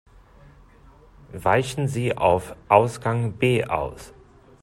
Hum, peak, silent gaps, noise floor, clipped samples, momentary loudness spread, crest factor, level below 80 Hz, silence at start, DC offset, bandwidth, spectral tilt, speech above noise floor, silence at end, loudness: none; 0 dBFS; none; -51 dBFS; under 0.1%; 9 LU; 24 dB; -50 dBFS; 1.3 s; under 0.1%; 13.5 kHz; -6 dB/octave; 29 dB; 0.55 s; -22 LUFS